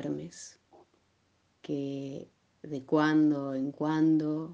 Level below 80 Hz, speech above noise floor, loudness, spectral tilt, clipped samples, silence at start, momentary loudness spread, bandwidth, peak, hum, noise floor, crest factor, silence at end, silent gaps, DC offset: -76 dBFS; 42 dB; -29 LUFS; -7 dB/octave; under 0.1%; 0 s; 20 LU; 8.2 kHz; -14 dBFS; none; -71 dBFS; 18 dB; 0 s; none; under 0.1%